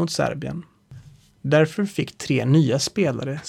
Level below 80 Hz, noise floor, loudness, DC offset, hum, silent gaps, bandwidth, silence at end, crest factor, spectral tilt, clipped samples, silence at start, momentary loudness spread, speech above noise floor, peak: -56 dBFS; -47 dBFS; -22 LUFS; under 0.1%; none; none; 14 kHz; 0 s; 18 dB; -5.5 dB/octave; under 0.1%; 0 s; 14 LU; 25 dB; -6 dBFS